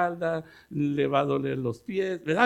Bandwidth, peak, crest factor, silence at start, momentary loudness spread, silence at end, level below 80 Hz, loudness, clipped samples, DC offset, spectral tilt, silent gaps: 11.5 kHz; -6 dBFS; 20 dB; 0 s; 7 LU; 0 s; -64 dBFS; -28 LUFS; under 0.1%; under 0.1%; -7 dB/octave; none